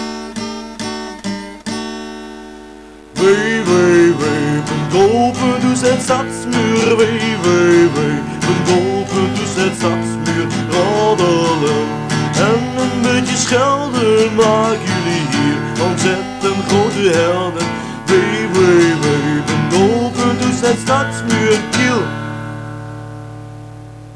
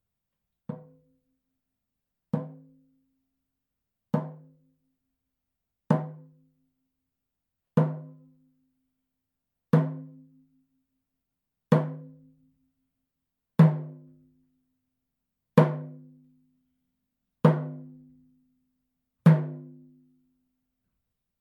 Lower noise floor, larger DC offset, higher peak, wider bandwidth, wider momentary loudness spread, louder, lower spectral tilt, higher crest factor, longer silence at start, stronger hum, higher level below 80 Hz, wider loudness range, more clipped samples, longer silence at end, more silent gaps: second, -36 dBFS vs -85 dBFS; neither; about the same, -4 dBFS vs -2 dBFS; first, 11 kHz vs 4.8 kHz; second, 14 LU vs 23 LU; first, -14 LUFS vs -26 LUFS; second, -5 dB/octave vs -10 dB/octave; second, 10 dB vs 28 dB; second, 0 s vs 0.7 s; neither; first, -46 dBFS vs -78 dBFS; second, 3 LU vs 10 LU; neither; second, 0 s vs 1.7 s; neither